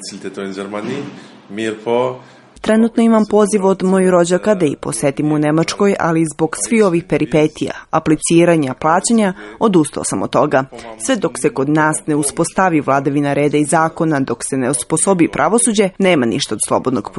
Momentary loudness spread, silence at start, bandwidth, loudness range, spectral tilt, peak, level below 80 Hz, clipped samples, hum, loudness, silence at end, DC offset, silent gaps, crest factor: 11 LU; 0 s; 11.5 kHz; 2 LU; -5 dB/octave; 0 dBFS; -50 dBFS; under 0.1%; none; -15 LUFS; 0 s; under 0.1%; none; 14 dB